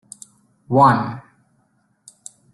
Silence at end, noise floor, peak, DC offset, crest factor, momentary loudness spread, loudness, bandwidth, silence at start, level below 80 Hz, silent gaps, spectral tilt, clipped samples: 1.35 s; -64 dBFS; -2 dBFS; under 0.1%; 20 dB; 26 LU; -17 LUFS; 12 kHz; 0.7 s; -58 dBFS; none; -7 dB/octave; under 0.1%